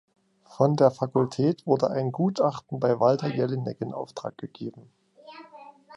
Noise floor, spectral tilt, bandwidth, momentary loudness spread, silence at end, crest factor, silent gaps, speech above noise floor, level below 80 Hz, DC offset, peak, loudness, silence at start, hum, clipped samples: -49 dBFS; -8 dB/octave; 11 kHz; 16 LU; 0 s; 20 dB; none; 24 dB; -70 dBFS; under 0.1%; -6 dBFS; -25 LUFS; 0.5 s; none; under 0.1%